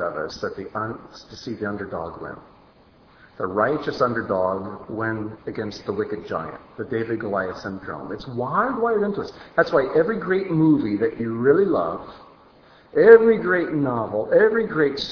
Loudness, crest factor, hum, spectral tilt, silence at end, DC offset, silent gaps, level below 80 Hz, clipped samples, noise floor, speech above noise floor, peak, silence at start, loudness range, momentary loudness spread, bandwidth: -22 LUFS; 22 dB; none; -7.5 dB/octave; 0 s; under 0.1%; none; -56 dBFS; under 0.1%; -53 dBFS; 31 dB; 0 dBFS; 0 s; 10 LU; 15 LU; 5.4 kHz